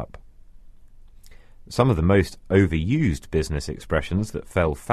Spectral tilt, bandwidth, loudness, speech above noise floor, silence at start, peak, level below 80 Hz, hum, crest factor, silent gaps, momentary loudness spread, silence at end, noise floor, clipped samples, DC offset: -7 dB/octave; 13 kHz; -23 LUFS; 23 dB; 0 s; -2 dBFS; -36 dBFS; none; 22 dB; none; 8 LU; 0 s; -45 dBFS; under 0.1%; under 0.1%